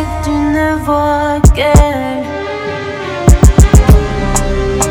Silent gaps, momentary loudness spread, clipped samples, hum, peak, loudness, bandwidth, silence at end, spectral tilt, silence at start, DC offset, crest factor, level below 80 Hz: none; 12 LU; 5%; none; 0 dBFS; -11 LUFS; over 20 kHz; 0 s; -6 dB/octave; 0 s; under 0.1%; 10 dB; -14 dBFS